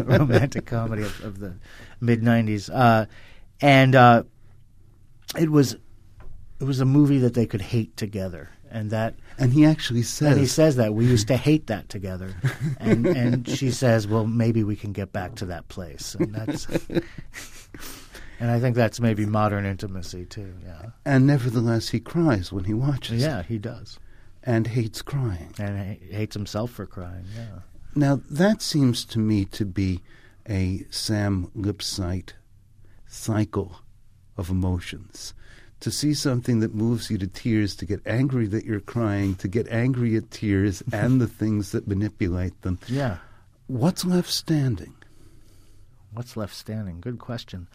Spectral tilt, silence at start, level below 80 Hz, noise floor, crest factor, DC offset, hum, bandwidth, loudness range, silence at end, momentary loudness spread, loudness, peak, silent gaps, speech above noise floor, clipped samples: -6.5 dB/octave; 0 s; -46 dBFS; -50 dBFS; 20 dB; under 0.1%; none; 15.5 kHz; 9 LU; 0.1 s; 18 LU; -23 LUFS; -2 dBFS; none; 27 dB; under 0.1%